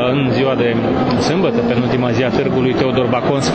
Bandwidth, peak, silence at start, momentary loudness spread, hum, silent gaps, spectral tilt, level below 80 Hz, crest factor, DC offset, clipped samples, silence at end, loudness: 8 kHz; -2 dBFS; 0 s; 1 LU; none; none; -6.5 dB/octave; -40 dBFS; 12 dB; under 0.1%; under 0.1%; 0 s; -15 LUFS